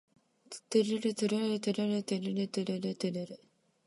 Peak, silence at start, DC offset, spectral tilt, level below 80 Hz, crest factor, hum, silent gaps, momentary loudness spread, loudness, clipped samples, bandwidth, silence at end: -16 dBFS; 0.5 s; under 0.1%; -5.5 dB/octave; -82 dBFS; 18 dB; none; none; 15 LU; -33 LUFS; under 0.1%; 11.5 kHz; 0.5 s